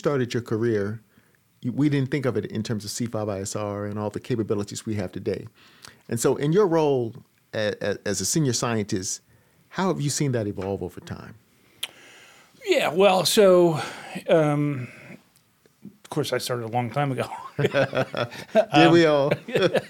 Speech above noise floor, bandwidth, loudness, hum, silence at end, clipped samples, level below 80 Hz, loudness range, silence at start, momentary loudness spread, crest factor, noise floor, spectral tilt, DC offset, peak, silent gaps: 38 dB; 18 kHz; -24 LUFS; none; 0 s; under 0.1%; -64 dBFS; 8 LU; 0.05 s; 16 LU; 22 dB; -61 dBFS; -5 dB/octave; under 0.1%; -2 dBFS; none